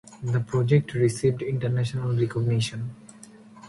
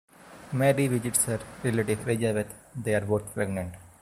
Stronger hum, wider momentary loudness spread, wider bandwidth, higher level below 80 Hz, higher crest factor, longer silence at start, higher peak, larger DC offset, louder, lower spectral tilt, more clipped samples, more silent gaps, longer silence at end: neither; about the same, 9 LU vs 10 LU; second, 11.5 kHz vs 16 kHz; about the same, -56 dBFS vs -56 dBFS; about the same, 18 dB vs 20 dB; second, 0.05 s vs 0.2 s; about the same, -8 dBFS vs -8 dBFS; neither; first, -25 LUFS vs -28 LUFS; first, -7 dB/octave vs -5 dB/octave; neither; neither; second, 0 s vs 0.15 s